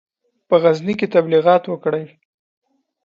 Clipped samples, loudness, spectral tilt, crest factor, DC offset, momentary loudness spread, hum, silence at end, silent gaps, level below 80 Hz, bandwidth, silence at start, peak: under 0.1%; -17 LUFS; -7.5 dB/octave; 18 dB; under 0.1%; 8 LU; none; 1 s; none; -66 dBFS; 7.2 kHz; 0.5 s; 0 dBFS